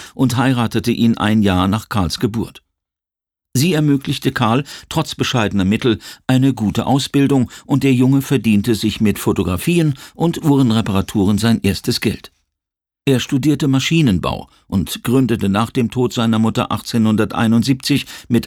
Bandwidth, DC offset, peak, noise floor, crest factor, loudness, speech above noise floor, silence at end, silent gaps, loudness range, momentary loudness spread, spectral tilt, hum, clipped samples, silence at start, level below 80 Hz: 18 kHz; under 0.1%; -2 dBFS; -89 dBFS; 14 dB; -16 LUFS; 73 dB; 0 s; none; 3 LU; 6 LU; -6 dB/octave; none; under 0.1%; 0 s; -42 dBFS